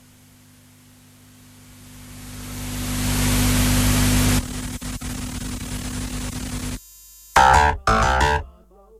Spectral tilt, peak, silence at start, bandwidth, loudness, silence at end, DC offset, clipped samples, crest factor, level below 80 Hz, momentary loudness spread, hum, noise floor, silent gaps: -4 dB/octave; -2 dBFS; 1.7 s; 16 kHz; -21 LUFS; 0.5 s; under 0.1%; under 0.1%; 20 dB; -30 dBFS; 19 LU; 50 Hz at -30 dBFS; -50 dBFS; none